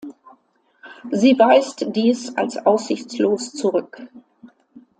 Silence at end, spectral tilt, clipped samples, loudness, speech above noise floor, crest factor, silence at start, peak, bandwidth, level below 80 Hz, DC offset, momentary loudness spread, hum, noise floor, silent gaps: 0.55 s; -5 dB/octave; under 0.1%; -19 LUFS; 41 dB; 18 dB; 0.05 s; -2 dBFS; 9.4 kHz; -70 dBFS; under 0.1%; 21 LU; none; -60 dBFS; none